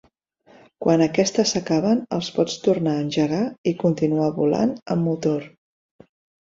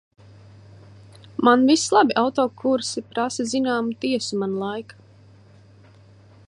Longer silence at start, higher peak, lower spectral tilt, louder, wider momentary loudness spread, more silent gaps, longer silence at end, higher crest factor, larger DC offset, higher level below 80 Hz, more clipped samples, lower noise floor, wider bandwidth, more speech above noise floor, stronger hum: second, 0.8 s vs 1.4 s; about the same, -4 dBFS vs -2 dBFS; first, -5.5 dB/octave vs -4 dB/octave; about the same, -22 LUFS vs -21 LUFS; second, 5 LU vs 11 LU; first, 3.58-3.64 s, 4.82-4.86 s vs none; second, 1 s vs 1.65 s; about the same, 18 dB vs 22 dB; neither; about the same, -60 dBFS vs -64 dBFS; neither; first, -57 dBFS vs -50 dBFS; second, 7.8 kHz vs 11 kHz; first, 36 dB vs 29 dB; neither